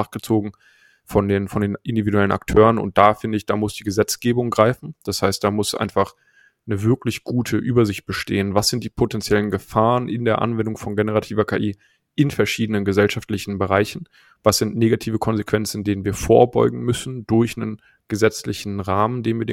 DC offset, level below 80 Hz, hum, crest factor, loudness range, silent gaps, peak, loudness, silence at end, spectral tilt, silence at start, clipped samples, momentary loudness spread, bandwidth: under 0.1%; -44 dBFS; none; 20 dB; 3 LU; none; 0 dBFS; -20 LUFS; 0 s; -5.5 dB/octave; 0 s; under 0.1%; 10 LU; 16.5 kHz